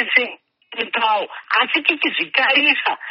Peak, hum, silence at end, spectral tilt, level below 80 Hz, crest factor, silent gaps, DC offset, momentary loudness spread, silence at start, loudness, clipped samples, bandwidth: 0 dBFS; none; 0 s; 3 dB/octave; -76 dBFS; 20 dB; none; under 0.1%; 11 LU; 0 s; -17 LUFS; under 0.1%; 6 kHz